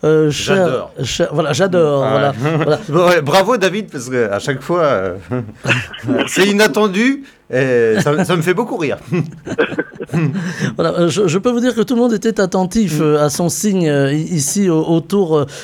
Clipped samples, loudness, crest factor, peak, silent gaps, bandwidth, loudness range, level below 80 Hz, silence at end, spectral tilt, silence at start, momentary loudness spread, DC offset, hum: under 0.1%; -15 LUFS; 14 dB; 0 dBFS; none; 20 kHz; 3 LU; -48 dBFS; 0 s; -5 dB/octave; 0.05 s; 8 LU; under 0.1%; none